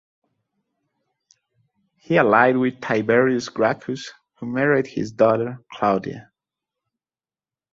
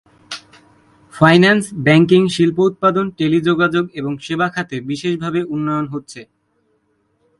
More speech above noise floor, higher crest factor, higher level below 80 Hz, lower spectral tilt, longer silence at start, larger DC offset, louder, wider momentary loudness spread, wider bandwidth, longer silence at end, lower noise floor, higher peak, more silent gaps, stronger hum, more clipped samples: first, over 70 dB vs 48 dB; about the same, 20 dB vs 16 dB; second, -62 dBFS vs -54 dBFS; about the same, -6.5 dB/octave vs -6.5 dB/octave; first, 2.1 s vs 0.3 s; neither; second, -20 LUFS vs -16 LUFS; second, 16 LU vs 19 LU; second, 7.8 kHz vs 11.5 kHz; first, 1.5 s vs 1.15 s; first, under -90 dBFS vs -63 dBFS; about the same, -2 dBFS vs 0 dBFS; neither; neither; neither